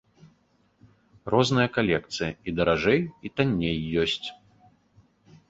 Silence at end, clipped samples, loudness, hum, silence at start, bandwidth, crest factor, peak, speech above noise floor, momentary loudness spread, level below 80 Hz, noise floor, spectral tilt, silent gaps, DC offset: 1.15 s; under 0.1%; -25 LUFS; none; 1.25 s; 8 kHz; 22 dB; -6 dBFS; 41 dB; 9 LU; -50 dBFS; -65 dBFS; -5.5 dB/octave; none; under 0.1%